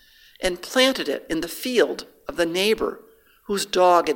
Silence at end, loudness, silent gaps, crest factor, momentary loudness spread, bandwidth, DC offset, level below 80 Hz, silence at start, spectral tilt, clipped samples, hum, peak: 0 s; -22 LUFS; none; 20 dB; 11 LU; 17 kHz; under 0.1%; -50 dBFS; 0.4 s; -3 dB/octave; under 0.1%; none; -4 dBFS